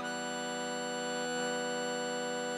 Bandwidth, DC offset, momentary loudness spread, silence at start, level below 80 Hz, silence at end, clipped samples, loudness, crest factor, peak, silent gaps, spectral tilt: 16 kHz; under 0.1%; 2 LU; 0 s; under -90 dBFS; 0 s; under 0.1%; -35 LUFS; 14 dB; -22 dBFS; none; -2.5 dB/octave